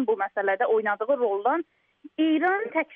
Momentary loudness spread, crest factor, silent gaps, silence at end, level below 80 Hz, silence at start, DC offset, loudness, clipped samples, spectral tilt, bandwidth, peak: 6 LU; 12 dB; none; 0 s; -80 dBFS; 0 s; under 0.1%; -25 LUFS; under 0.1%; -7 dB/octave; 3.7 kHz; -12 dBFS